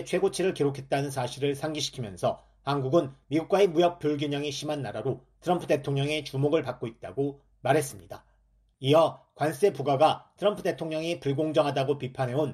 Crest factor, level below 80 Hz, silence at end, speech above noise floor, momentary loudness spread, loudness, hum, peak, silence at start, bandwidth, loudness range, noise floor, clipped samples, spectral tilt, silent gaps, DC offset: 20 dB; -62 dBFS; 0 s; 38 dB; 10 LU; -28 LUFS; none; -8 dBFS; 0 s; 14.5 kHz; 3 LU; -65 dBFS; under 0.1%; -5.5 dB/octave; none; under 0.1%